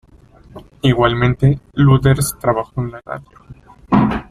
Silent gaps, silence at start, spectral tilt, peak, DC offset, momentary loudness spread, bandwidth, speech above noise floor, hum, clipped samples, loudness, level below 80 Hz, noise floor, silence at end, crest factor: none; 0.55 s; -6.5 dB/octave; 0 dBFS; under 0.1%; 13 LU; 14.5 kHz; 30 dB; none; under 0.1%; -16 LUFS; -36 dBFS; -45 dBFS; 0.05 s; 16 dB